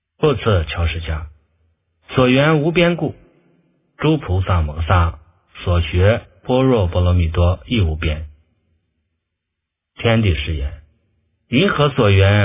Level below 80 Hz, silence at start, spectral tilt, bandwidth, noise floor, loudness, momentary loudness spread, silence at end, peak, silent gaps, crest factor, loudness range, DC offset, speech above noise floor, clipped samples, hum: -26 dBFS; 0.2 s; -11 dB/octave; 3.8 kHz; -79 dBFS; -17 LUFS; 11 LU; 0 s; 0 dBFS; none; 18 dB; 4 LU; under 0.1%; 63 dB; under 0.1%; none